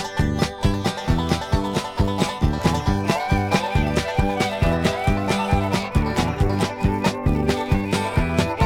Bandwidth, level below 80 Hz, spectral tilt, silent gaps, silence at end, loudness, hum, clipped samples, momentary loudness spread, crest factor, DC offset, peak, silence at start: 17.5 kHz; -28 dBFS; -6 dB/octave; none; 0 s; -22 LUFS; none; under 0.1%; 2 LU; 16 dB; under 0.1%; -4 dBFS; 0 s